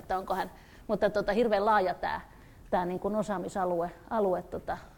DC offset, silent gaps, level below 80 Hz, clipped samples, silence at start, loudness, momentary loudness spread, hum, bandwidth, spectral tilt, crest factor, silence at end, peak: under 0.1%; none; -54 dBFS; under 0.1%; 0 s; -30 LUFS; 11 LU; none; 19 kHz; -6 dB/octave; 18 dB; 0.05 s; -12 dBFS